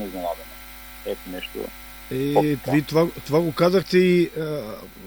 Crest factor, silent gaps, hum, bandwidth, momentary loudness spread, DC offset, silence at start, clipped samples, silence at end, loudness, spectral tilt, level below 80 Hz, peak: 18 dB; none; none; over 20 kHz; 17 LU; under 0.1%; 0 s; under 0.1%; 0 s; -22 LUFS; -6.5 dB/octave; -48 dBFS; -4 dBFS